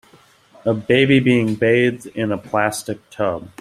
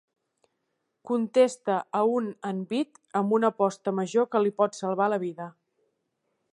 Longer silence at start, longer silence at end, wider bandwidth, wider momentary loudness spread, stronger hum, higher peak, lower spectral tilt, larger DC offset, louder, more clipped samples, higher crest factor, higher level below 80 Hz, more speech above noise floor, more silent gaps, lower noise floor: second, 0.65 s vs 1.05 s; second, 0.15 s vs 1.05 s; first, 14.5 kHz vs 11.5 kHz; first, 11 LU vs 8 LU; neither; first, -2 dBFS vs -8 dBFS; about the same, -6 dB/octave vs -6 dB/octave; neither; first, -18 LUFS vs -27 LUFS; neither; about the same, 18 dB vs 18 dB; first, -54 dBFS vs -82 dBFS; second, 33 dB vs 53 dB; neither; second, -51 dBFS vs -79 dBFS